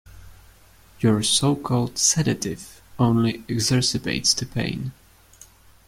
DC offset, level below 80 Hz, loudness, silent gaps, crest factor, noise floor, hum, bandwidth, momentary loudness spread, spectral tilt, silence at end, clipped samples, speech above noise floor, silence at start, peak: under 0.1%; -50 dBFS; -21 LUFS; none; 18 dB; -51 dBFS; none; 16 kHz; 12 LU; -4 dB/octave; 0.95 s; under 0.1%; 29 dB; 0.1 s; -6 dBFS